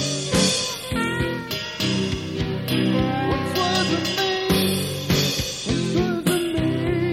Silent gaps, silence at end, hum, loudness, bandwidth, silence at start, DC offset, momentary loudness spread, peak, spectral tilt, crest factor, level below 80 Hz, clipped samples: none; 0 s; none; -22 LUFS; 16.5 kHz; 0 s; under 0.1%; 5 LU; -6 dBFS; -4.5 dB/octave; 16 dB; -40 dBFS; under 0.1%